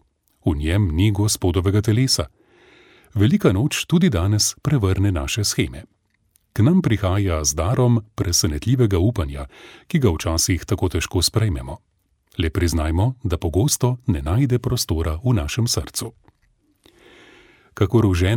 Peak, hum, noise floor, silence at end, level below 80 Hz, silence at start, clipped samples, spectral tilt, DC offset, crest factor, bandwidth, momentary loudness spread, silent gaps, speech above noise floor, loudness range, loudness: -2 dBFS; none; -64 dBFS; 0 s; -34 dBFS; 0.45 s; under 0.1%; -5 dB/octave; under 0.1%; 18 dB; 17.5 kHz; 9 LU; none; 44 dB; 3 LU; -20 LUFS